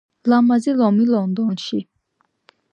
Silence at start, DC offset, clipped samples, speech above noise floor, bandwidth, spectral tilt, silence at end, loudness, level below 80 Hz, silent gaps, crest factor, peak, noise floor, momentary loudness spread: 0.25 s; under 0.1%; under 0.1%; 51 dB; 8.8 kHz; -7 dB/octave; 0.9 s; -18 LUFS; -70 dBFS; none; 14 dB; -4 dBFS; -68 dBFS; 10 LU